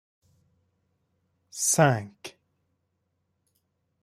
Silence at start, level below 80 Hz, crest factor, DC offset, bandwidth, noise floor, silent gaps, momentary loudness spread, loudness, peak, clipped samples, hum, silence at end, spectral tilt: 1.55 s; -70 dBFS; 26 dB; under 0.1%; 16 kHz; -77 dBFS; none; 24 LU; -23 LUFS; -6 dBFS; under 0.1%; none; 1.75 s; -4 dB/octave